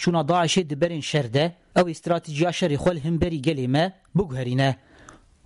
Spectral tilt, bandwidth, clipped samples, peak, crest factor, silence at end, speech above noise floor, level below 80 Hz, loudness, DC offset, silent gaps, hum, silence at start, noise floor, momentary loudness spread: -5.5 dB/octave; 11.5 kHz; under 0.1%; -10 dBFS; 12 dB; 0.35 s; 27 dB; -48 dBFS; -23 LUFS; under 0.1%; none; none; 0 s; -50 dBFS; 5 LU